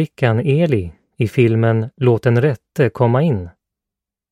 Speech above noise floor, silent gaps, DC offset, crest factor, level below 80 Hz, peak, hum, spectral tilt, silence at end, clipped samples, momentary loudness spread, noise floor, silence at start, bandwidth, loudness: 70 dB; none; under 0.1%; 16 dB; -48 dBFS; 0 dBFS; none; -9 dB/octave; 0.8 s; under 0.1%; 8 LU; -85 dBFS; 0 s; 9.8 kHz; -17 LUFS